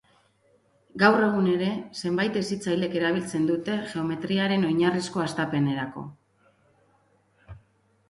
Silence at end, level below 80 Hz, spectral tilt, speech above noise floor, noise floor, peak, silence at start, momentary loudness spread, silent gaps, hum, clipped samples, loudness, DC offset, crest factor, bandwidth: 0.5 s; -64 dBFS; -6 dB/octave; 40 dB; -65 dBFS; -6 dBFS; 0.95 s; 9 LU; none; none; under 0.1%; -25 LUFS; under 0.1%; 22 dB; 11.5 kHz